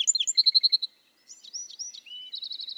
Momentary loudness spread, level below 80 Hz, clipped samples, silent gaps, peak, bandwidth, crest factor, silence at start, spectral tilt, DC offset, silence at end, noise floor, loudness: 19 LU; under -90 dBFS; under 0.1%; none; -8 dBFS; 15 kHz; 20 dB; 0 s; 7 dB/octave; under 0.1%; 0.05 s; -54 dBFS; -21 LUFS